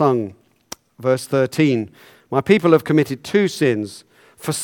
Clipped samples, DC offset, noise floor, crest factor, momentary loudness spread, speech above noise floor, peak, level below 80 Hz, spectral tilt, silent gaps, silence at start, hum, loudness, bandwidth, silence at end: under 0.1%; under 0.1%; -41 dBFS; 18 dB; 17 LU; 23 dB; 0 dBFS; -60 dBFS; -6 dB/octave; none; 0 s; none; -18 LUFS; 18 kHz; 0 s